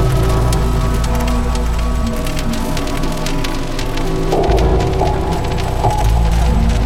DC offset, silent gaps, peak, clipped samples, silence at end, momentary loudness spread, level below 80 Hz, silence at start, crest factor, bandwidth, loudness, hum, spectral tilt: 2%; none; 0 dBFS; under 0.1%; 0 s; 5 LU; -16 dBFS; 0 s; 14 dB; 15.5 kHz; -17 LUFS; none; -6 dB/octave